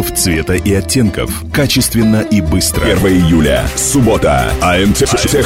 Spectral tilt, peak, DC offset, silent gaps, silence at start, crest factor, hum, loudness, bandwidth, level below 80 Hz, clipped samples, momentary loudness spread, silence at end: -4.5 dB/octave; 0 dBFS; under 0.1%; none; 0 s; 12 dB; none; -11 LUFS; 16.5 kHz; -24 dBFS; under 0.1%; 3 LU; 0 s